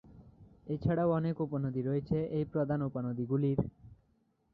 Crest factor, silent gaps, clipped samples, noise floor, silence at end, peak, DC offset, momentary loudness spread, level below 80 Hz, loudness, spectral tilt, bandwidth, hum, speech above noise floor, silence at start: 18 dB; none; under 0.1%; -73 dBFS; 0.6 s; -16 dBFS; under 0.1%; 6 LU; -58 dBFS; -34 LUFS; -12 dB/octave; 5 kHz; none; 41 dB; 0.05 s